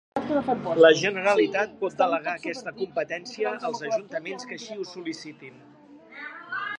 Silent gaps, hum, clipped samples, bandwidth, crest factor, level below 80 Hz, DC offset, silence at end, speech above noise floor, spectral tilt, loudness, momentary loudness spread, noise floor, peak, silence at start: none; none; under 0.1%; 10.5 kHz; 24 dB; -70 dBFS; under 0.1%; 0 s; 22 dB; -4 dB/octave; -25 LUFS; 20 LU; -48 dBFS; -4 dBFS; 0.15 s